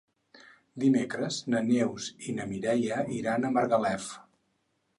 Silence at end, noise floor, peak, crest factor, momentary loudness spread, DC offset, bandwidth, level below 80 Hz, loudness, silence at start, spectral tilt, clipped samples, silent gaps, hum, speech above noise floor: 0.8 s; -75 dBFS; -12 dBFS; 18 dB; 10 LU; under 0.1%; 11.5 kHz; -68 dBFS; -29 LUFS; 0.35 s; -5.5 dB/octave; under 0.1%; none; none; 47 dB